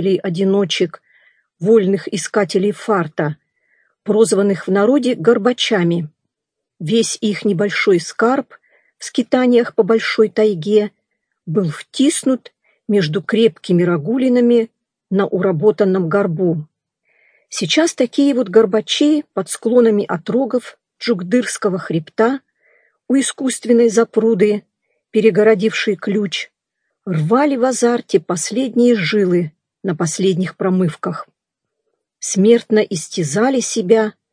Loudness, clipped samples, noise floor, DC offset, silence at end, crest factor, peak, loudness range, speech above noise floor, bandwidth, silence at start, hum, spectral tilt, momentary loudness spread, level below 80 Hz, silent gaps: -16 LUFS; under 0.1%; -81 dBFS; under 0.1%; 0.2 s; 16 dB; 0 dBFS; 3 LU; 65 dB; 10.5 kHz; 0 s; none; -5 dB/octave; 10 LU; -70 dBFS; none